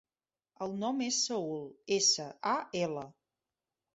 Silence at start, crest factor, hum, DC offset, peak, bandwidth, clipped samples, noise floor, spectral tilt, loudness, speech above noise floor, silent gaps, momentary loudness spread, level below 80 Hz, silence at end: 0.6 s; 20 dB; none; under 0.1%; -16 dBFS; 8.2 kHz; under 0.1%; under -90 dBFS; -2.5 dB/octave; -32 LUFS; over 56 dB; none; 15 LU; -78 dBFS; 0.85 s